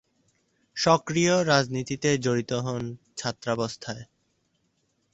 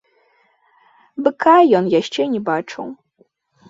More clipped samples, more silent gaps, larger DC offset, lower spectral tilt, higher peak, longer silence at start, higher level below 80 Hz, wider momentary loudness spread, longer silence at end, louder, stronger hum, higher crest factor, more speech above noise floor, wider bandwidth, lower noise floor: neither; neither; neither; second, -4.5 dB/octave vs -6 dB/octave; second, -6 dBFS vs -2 dBFS; second, 0.75 s vs 1.2 s; about the same, -62 dBFS vs -66 dBFS; second, 15 LU vs 19 LU; first, 1.1 s vs 0.75 s; second, -25 LUFS vs -16 LUFS; neither; about the same, 22 dB vs 18 dB; first, 47 dB vs 43 dB; about the same, 8.2 kHz vs 7.8 kHz; first, -72 dBFS vs -59 dBFS